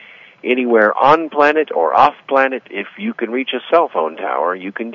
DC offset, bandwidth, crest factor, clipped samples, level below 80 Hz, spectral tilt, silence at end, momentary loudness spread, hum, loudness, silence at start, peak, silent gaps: under 0.1%; 7.4 kHz; 16 dB; under 0.1%; -62 dBFS; -6 dB/octave; 0 s; 12 LU; none; -15 LUFS; 0.45 s; 0 dBFS; none